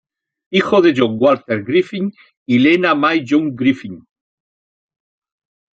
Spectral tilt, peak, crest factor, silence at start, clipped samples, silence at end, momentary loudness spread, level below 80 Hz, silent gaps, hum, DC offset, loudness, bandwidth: -6.5 dB/octave; -2 dBFS; 16 dB; 0.5 s; under 0.1%; 1.75 s; 11 LU; -62 dBFS; 2.37-2.46 s; none; under 0.1%; -15 LUFS; 7.8 kHz